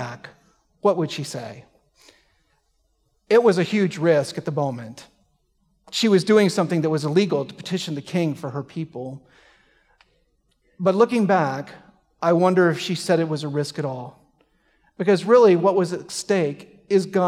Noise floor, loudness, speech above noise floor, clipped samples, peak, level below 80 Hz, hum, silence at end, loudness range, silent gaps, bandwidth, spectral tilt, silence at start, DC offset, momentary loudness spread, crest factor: -67 dBFS; -21 LUFS; 47 dB; under 0.1%; -4 dBFS; -68 dBFS; none; 0 s; 6 LU; none; 14.5 kHz; -6 dB/octave; 0 s; under 0.1%; 17 LU; 18 dB